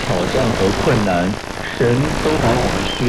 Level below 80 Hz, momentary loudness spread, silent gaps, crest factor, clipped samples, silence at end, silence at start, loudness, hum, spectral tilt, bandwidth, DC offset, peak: -30 dBFS; 4 LU; none; 12 dB; under 0.1%; 0 s; 0 s; -17 LUFS; none; -5.5 dB/octave; 14.5 kHz; under 0.1%; -4 dBFS